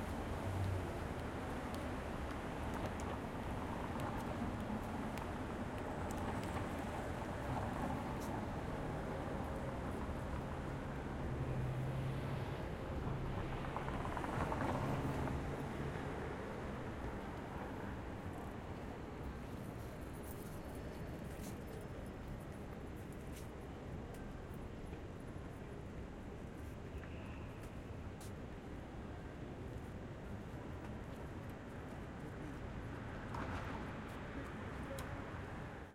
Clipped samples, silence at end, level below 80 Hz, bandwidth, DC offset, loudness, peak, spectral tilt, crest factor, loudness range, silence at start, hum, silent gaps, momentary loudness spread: under 0.1%; 0 s; -52 dBFS; 16 kHz; under 0.1%; -45 LUFS; -26 dBFS; -6.5 dB/octave; 18 dB; 8 LU; 0 s; none; none; 8 LU